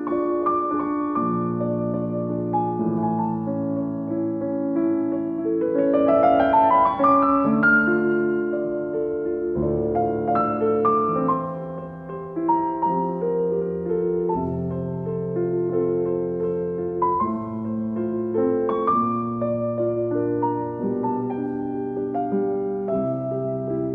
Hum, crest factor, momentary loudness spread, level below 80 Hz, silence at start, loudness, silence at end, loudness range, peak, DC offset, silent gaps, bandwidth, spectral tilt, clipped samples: none; 16 dB; 9 LU; -54 dBFS; 0 s; -23 LUFS; 0 s; 6 LU; -8 dBFS; under 0.1%; none; 4.5 kHz; -11 dB/octave; under 0.1%